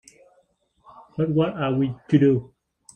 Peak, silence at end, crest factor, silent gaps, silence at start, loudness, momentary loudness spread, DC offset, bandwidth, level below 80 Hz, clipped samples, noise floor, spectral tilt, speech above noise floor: -4 dBFS; 0.5 s; 20 dB; none; 1.15 s; -22 LUFS; 9 LU; under 0.1%; 9 kHz; -58 dBFS; under 0.1%; -65 dBFS; -8.5 dB/octave; 44 dB